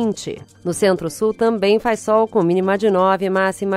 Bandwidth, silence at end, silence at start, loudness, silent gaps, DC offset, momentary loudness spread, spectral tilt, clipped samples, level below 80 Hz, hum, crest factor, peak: 14.5 kHz; 0 s; 0 s; -18 LUFS; none; under 0.1%; 9 LU; -5.5 dB/octave; under 0.1%; -54 dBFS; none; 14 dB; -2 dBFS